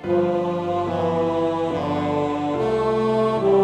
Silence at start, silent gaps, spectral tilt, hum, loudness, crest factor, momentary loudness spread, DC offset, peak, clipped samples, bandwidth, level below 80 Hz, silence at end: 0 s; none; -7.5 dB/octave; none; -22 LUFS; 14 dB; 4 LU; under 0.1%; -8 dBFS; under 0.1%; 9.6 kHz; -50 dBFS; 0 s